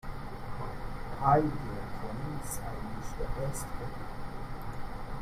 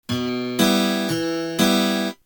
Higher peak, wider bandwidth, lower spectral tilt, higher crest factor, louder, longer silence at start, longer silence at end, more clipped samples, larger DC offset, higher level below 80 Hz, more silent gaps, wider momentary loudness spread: second, -12 dBFS vs -4 dBFS; second, 15 kHz vs over 20 kHz; first, -6 dB/octave vs -4 dB/octave; about the same, 22 dB vs 18 dB; second, -36 LUFS vs -20 LUFS; about the same, 0.05 s vs 0.1 s; about the same, 0 s vs 0.1 s; neither; neither; first, -42 dBFS vs -56 dBFS; neither; first, 15 LU vs 7 LU